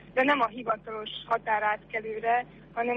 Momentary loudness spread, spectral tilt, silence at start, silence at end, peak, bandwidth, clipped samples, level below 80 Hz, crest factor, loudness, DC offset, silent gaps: 10 LU; -6 dB/octave; 0 s; 0 s; -14 dBFS; 6.6 kHz; under 0.1%; -62 dBFS; 16 dB; -29 LUFS; under 0.1%; none